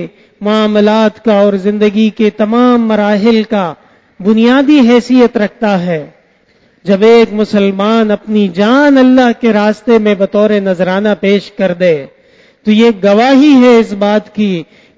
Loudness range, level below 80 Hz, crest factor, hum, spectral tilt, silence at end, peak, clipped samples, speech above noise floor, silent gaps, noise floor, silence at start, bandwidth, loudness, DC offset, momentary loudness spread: 2 LU; -52 dBFS; 10 dB; none; -7 dB/octave; 0.35 s; 0 dBFS; 0.2%; 41 dB; none; -50 dBFS; 0 s; 7.8 kHz; -9 LUFS; under 0.1%; 9 LU